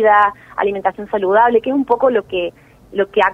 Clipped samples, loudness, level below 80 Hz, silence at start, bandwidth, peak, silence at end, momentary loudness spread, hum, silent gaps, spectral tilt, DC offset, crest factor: under 0.1%; -16 LUFS; -52 dBFS; 0 s; 6.2 kHz; -2 dBFS; 0 s; 10 LU; none; none; -6.5 dB/octave; under 0.1%; 14 dB